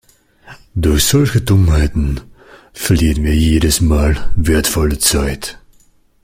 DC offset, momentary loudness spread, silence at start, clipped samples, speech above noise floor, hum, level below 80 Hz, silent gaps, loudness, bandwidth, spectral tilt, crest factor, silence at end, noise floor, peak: under 0.1%; 10 LU; 0.5 s; under 0.1%; 38 dB; none; -22 dBFS; none; -14 LUFS; 16.5 kHz; -5 dB/octave; 14 dB; 0.7 s; -50 dBFS; 0 dBFS